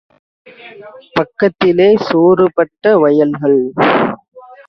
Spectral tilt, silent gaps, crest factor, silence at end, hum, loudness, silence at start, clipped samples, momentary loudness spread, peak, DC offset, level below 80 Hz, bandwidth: -8 dB/octave; 4.28-4.32 s; 14 dB; 0.3 s; none; -12 LUFS; 0.65 s; under 0.1%; 9 LU; 0 dBFS; under 0.1%; -54 dBFS; 6.2 kHz